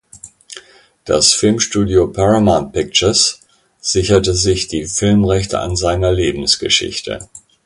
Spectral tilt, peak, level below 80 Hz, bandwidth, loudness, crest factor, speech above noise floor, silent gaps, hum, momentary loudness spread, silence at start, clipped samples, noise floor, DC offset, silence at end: -4 dB/octave; 0 dBFS; -32 dBFS; 11.5 kHz; -14 LUFS; 16 dB; 27 dB; none; none; 16 LU; 0.15 s; under 0.1%; -41 dBFS; under 0.1%; 0.3 s